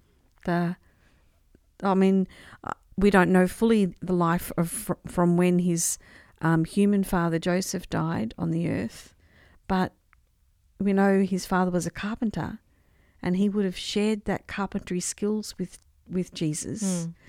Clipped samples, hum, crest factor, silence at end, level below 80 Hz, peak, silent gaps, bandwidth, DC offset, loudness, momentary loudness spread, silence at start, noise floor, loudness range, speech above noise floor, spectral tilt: under 0.1%; none; 22 dB; 0.15 s; -50 dBFS; -4 dBFS; none; 16 kHz; under 0.1%; -26 LUFS; 13 LU; 0.45 s; -64 dBFS; 6 LU; 39 dB; -5.5 dB/octave